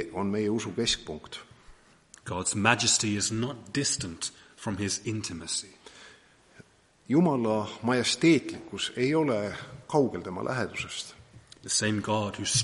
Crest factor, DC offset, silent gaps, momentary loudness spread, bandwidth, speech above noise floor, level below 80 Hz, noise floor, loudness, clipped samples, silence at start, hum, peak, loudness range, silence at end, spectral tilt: 24 dB; under 0.1%; none; 16 LU; 11.5 kHz; 29 dB; -60 dBFS; -57 dBFS; -28 LUFS; under 0.1%; 0 s; none; -4 dBFS; 5 LU; 0 s; -3.5 dB/octave